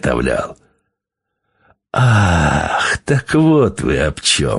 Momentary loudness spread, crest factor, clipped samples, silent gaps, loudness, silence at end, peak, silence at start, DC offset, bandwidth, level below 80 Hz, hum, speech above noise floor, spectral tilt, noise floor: 7 LU; 16 dB; under 0.1%; none; -15 LUFS; 0 s; 0 dBFS; 0.05 s; under 0.1%; 11.5 kHz; -32 dBFS; none; 64 dB; -5 dB/octave; -78 dBFS